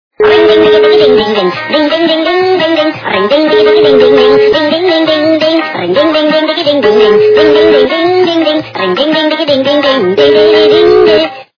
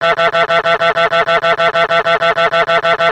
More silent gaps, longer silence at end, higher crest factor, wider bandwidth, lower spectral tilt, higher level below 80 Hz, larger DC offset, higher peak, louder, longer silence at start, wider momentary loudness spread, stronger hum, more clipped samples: neither; first, 0.15 s vs 0 s; second, 6 dB vs 12 dB; second, 5.4 kHz vs 9.2 kHz; first, -5.5 dB/octave vs -3.5 dB/octave; about the same, -44 dBFS vs -48 dBFS; second, under 0.1% vs 0.1%; about the same, 0 dBFS vs 0 dBFS; first, -7 LUFS vs -12 LUFS; first, 0.2 s vs 0 s; first, 6 LU vs 1 LU; neither; first, 2% vs under 0.1%